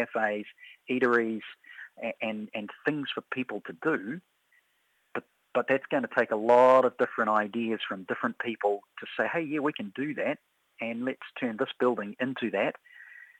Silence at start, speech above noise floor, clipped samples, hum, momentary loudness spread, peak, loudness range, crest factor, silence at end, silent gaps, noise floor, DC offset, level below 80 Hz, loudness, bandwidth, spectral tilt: 0 s; 43 dB; under 0.1%; none; 15 LU; -8 dBFS; 8 LU; 20 dB; 0.15 s; none; -72 dBFS; under 0.1%; -82 dBFS; -29 LUFS; 9 kHz; -6.5 dB/octave